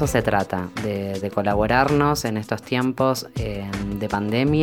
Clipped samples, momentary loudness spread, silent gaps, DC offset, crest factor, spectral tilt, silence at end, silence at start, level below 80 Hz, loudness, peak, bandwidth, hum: under 0.1%; 9 LU; none; under 0.1%; 20 dB; -6 dB/octave; 0 s; 0 s; -40 dBFS; -23 LUFS; -2 dBFS; 20 kHz; none